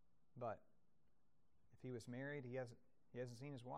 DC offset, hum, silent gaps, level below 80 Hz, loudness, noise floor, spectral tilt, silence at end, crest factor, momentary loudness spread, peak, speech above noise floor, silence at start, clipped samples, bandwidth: under 0.1%; none; none; -86 dBFS; -53 LUFS; -85 dBFS; -6.5 dB/octave; 0 s; 16 dB; 9 LU; -38 dBFS; 33 dB; 0.35 s; under 0.1%; 13 kHz